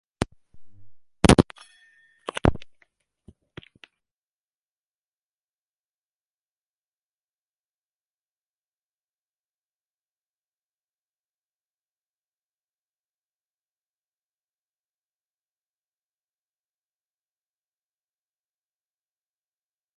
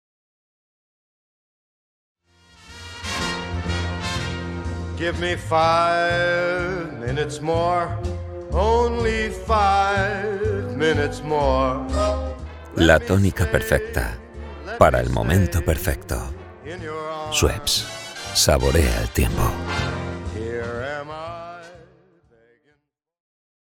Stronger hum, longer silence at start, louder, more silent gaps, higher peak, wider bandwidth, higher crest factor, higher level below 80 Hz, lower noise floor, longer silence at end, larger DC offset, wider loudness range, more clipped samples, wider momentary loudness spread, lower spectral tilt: first, 50 Hz at -65 dBFS vs none; second, 0.2 s vs 2.65 s; about the same, -23 LUFS vs -22 LUFS; neither; about the same, 0 dBFS vs 0 dBFS; second, 11 kHz vs 17.5 kHz; first, 34 dB vs 22 dB; second, -44 dBFS vs -32 dBFS; first, under -90 dBFS vs -69 dBFS; first, 17.35 s vs 1.85 s; neither; about the same, 8 LU vs 10 LU; neither; first, 24 LU vs 15 LU; about the same, -5.5 dB/octave vs -4.5 dB/octave